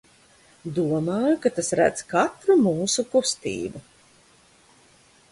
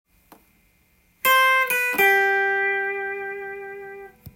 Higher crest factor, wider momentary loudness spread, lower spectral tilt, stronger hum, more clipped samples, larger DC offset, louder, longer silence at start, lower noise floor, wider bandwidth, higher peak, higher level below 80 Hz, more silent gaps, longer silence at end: about the same, 18 dB vs 16 dB; second, 12 LU vs 20 LU; first, -4.5 dB/octave vs -1 dB/octave; neither; neither; neither; second, -23 LUFS vs -19 LUFS; second, 0.65 s vs 1.25 s; second, -57 dBFS vs -62 dBFS; second, 11.5 kHz vs 16.5 kHz; about the same, -6 dBFS vs -6 dBFS; about the same, -60 dBFS vs -64 dBFS; neither; first, 1.5 s vs 0.05 s